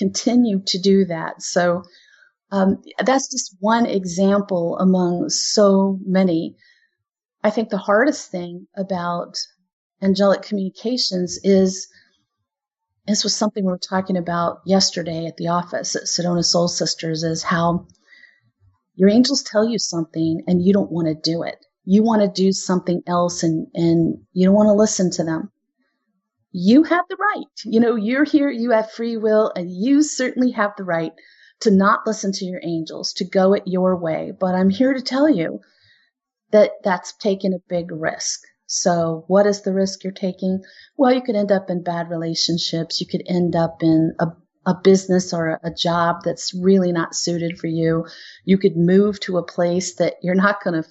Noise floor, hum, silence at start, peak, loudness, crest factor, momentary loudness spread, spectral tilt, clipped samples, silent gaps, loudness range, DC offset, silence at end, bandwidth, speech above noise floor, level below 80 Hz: -82 dBFS; none; 0 s; -2 dBFS; -19 LUFS; 16 dB; 10 LU; -5 dB/octave; under 0.1%; 9.73-9.90 s; 3 LU; under 0.1%; 0.05 s; 8.2 kHz; 63 dB; -60 dBFS